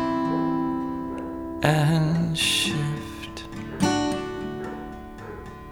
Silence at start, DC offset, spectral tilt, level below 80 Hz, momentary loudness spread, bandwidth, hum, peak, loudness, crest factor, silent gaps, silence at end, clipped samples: 0 s; under 0.1%; -5 dB/octave; -46 dBFS; 17 LU; 18.5 kHz; none; -6 dBFS; -25 LUFS; 20 dB; none; 0 s; under 0.1%